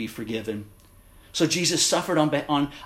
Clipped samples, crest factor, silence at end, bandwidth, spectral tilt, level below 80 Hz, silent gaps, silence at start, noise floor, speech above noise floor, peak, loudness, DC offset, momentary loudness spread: under 0.1%; 20 dB; 0 s; 16 kHz; -3.5 dB/octave; -56 dBFS; none; 0 s; -51 dBFS; 27 dB; -6 dBFS; -24 LUFS; under 0.1%; 13 LU